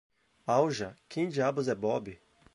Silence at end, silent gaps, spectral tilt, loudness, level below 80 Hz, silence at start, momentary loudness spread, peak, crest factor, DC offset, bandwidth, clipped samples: 0.4 s; none; -6 dB/octave; -31 LUFS; -68 dBFS; 0.45 s; 11 LU; -12 dBFS; 20 dB; under 0.1%; 11.5 kHz; under 0.1%